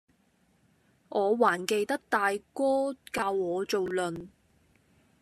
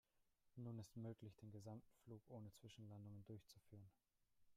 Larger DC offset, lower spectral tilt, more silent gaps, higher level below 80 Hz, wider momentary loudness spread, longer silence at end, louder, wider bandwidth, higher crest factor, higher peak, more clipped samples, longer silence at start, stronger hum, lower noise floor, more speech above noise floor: neither; second, -4 dB/octave vs -7 dB/octave; neither; first, -70 dBFS vs -84 dBFS; second, 7 LU vs 10 LU; first, 0.95 s vs 0 s; first, -29 LUFS vs -60 LUFS; about the same, 14 kHz vs 15 kHz; first, 22 dB vs 16 dB; first, -8 dBFS vs -42 dBFS; neither; first, 1.1 s vs 0.2 s; neither; second, -68 dBFS vs -84 dBFS; first, 40 dB vs 25 dB